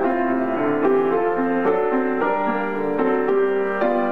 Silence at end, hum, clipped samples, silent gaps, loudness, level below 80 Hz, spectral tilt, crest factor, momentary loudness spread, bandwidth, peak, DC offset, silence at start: 0 s; none; under 0.1%; none; -20 LUFS; -58 dBFS; -8.5 dB/octave; 12 dB; 3 LU; 4.9 kHz; -8 dBFS; 2%; 0 s